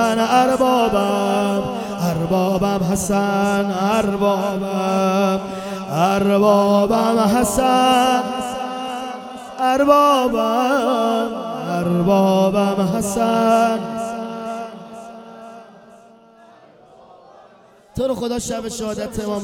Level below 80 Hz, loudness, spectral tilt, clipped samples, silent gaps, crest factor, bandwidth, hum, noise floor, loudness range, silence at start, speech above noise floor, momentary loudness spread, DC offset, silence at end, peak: -46 dBFS; -18 LUFS; -5.5 dB/octave; under 0.1%; none; 18 dB; 17 kHz; none; -48 dBFS; 12 LU; 0 s; 32 dB; 13 LU; under 0.1%; 0 s; 0 dBFS